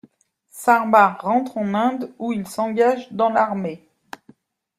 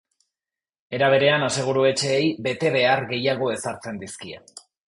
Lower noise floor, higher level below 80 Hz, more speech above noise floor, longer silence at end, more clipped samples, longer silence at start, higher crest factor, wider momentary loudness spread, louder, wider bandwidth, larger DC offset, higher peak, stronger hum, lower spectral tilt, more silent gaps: second, -57 dBFS vs under -90 dBFS; second, -68 dBFS vs -62 dBFS; second, 38 dB vs over 68 dB; first, 1 s vs 0.3 s; neither; second, 0.55 s vs 0.9 s; about the same, 20 dB vs 18 dB; second, 12 LU vs 16 LU; about the same, -20 LUFS vs -21 LUFS; first, 16 kHz vs 11.5 kHz; neither; first, -2 dBFS vs -6 dBFS; neither; first, -6 dB/octave vs -4 dB/octave; neither